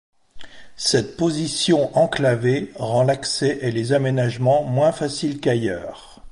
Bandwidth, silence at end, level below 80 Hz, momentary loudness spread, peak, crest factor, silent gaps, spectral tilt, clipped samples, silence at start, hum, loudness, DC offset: 11.5 kHz; 0 s; -52 dBFS; 6 LU; -6 dBFS; 16 dB; none; -5 dB/octave; under 0.1%; 0.35 s; none; -20 LUFS; under 0.1%